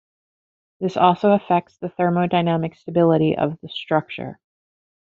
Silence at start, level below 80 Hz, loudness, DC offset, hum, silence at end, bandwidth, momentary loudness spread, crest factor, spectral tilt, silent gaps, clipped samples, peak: 0.8 s; -62 dBFS; -20 LUFS; under 0.1%; none; 0.85 s; 7 kHz; 15 LU; 20 dB; -6 dB/octave; none; under 0.1%; -2 dBFS